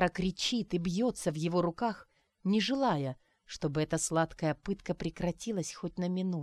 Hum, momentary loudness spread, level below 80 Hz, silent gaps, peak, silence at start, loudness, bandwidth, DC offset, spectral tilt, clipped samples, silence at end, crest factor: none; 8 LU; -56 dBFS; none; -16 dBFS; 0 s; -33 LUFS; 13 kHz; under 0.1%; -5 dB/octave; under 0.1%; 0 s; 16 dB